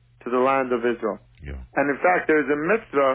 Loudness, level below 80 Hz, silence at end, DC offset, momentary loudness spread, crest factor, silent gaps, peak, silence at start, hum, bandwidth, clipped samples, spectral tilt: -22 LUFS; -46 dBFS; 0 s; under 0.1%; 12 LU; 14 dB; none; -8 dBFS; 0.25 s; none; 4 kHz; under 0.1%; -9.5 dB/octave